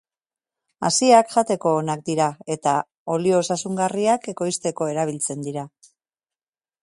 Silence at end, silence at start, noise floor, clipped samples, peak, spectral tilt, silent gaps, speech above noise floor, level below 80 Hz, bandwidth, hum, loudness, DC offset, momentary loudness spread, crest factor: 1.15 s; 0.8 s; under -90 dBFS; under 0.1%; -2 dBFS; -4.5 dB/octave; 2.97-3.06 s; over 69 dB; -68 dBFS; 11.5 kHz; none; -21 LUFS; under 0.1%; 11 LU; 20 dB